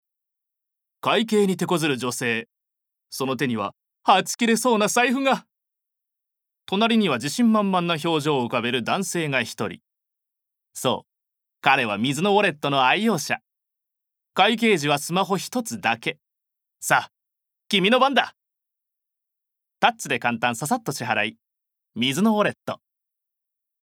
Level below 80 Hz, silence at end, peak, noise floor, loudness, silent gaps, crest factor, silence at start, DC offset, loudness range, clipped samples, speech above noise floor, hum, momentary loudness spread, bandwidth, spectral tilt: -74 dBFS; 1.1 s; -2 dBFS; -84 dBFS; -22 LUFS; none; 22 dB; 1.05 s; under 0.1%; 4 LU; under 0.1%; 63 dB; none; 10 LU; 18 kHz; -4 dB/octave